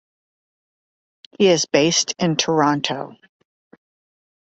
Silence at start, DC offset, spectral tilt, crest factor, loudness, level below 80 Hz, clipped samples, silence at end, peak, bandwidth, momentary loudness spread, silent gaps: 1.4 s; under 0.1%; -3.5 dB/octave; 20 dB; -18 LUFS; -62 dBFS; under 0.1%; 1.3 s; -2 dBFS; 8.2 kHz; 10 LU; none